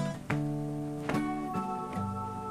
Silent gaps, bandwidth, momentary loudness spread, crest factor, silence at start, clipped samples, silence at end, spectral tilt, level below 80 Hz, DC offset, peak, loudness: none; 15 kHz; 3 LU; 20 dB; 0 s; under 0.1%; 0 s; -7 dB/octave; -54 dBFS; under 0.1%; -14 dBFS; -34 LUFS